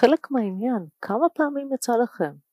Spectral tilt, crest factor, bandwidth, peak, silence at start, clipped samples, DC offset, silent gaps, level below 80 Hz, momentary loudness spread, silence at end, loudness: -5.5 dB/octave; 20 dB; 15.5 kHz; -4 dBFS; 0 s; under 0.1%; under 0.1%; none; -80 dBFS; 7 LU; 0.2 s; -24 LUFS